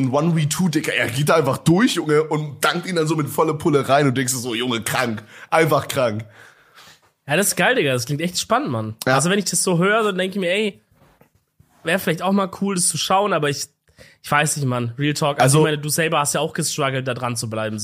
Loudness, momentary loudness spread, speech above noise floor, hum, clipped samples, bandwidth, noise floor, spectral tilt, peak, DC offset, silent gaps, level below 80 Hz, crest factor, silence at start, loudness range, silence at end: -19 LUFS; 7 LU; 38 dB; none; under 0.1%; 15.5 kHz; -58 dBFS; -4 dB/octave; 0 dBFS; under 0.1%; none; -60 dBFS; 20 dB; 0 s; 3 LU; 0 s